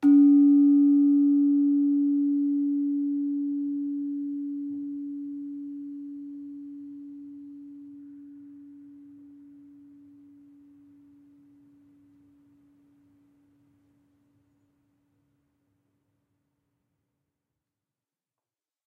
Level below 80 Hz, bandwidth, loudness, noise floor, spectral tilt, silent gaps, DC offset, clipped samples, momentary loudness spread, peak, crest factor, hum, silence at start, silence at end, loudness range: -84 dBFS; 1.5 kHz; -24 LUFS; under -90 dBFS; -9.5 dB/octave; none; under 0.1%; under 0.1%; 26 LU; -12 dBFS; 16 dB; none; 0 s; 10.15 s; 26 LU